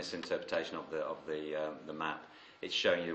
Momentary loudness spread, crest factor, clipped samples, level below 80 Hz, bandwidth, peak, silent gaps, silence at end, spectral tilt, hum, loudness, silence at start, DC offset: 11 LU; 20 dB; under 0.1%; -76 dBFS; 8.4 kHz; -18 dBFS; none; 0 s; -3.5 dB/octave; none; -38 LUFS; 0 s; under 0.1%